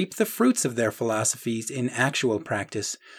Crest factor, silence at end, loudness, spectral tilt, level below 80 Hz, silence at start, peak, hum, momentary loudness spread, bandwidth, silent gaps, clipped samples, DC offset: 18 dB; 0 s; -25 LUFS; -4 dB/octave; -72 dBFS; 0 s; -8 dBFS; none; 7 LU; over 20 kHz; none; under 0.1%; under 0.1%